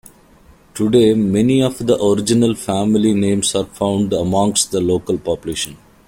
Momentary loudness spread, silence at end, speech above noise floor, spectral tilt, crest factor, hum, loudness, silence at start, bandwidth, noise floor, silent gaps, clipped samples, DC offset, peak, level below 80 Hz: 8 LU; 0.35 s; 32 dB; -5 dB/octave; 16 dB; none; -16 LUFS; 0.75 s; 16.5 kHz; -47 dBFS; none; under 0.1%; under 0.1%; -2 dBFS; -46 dBFS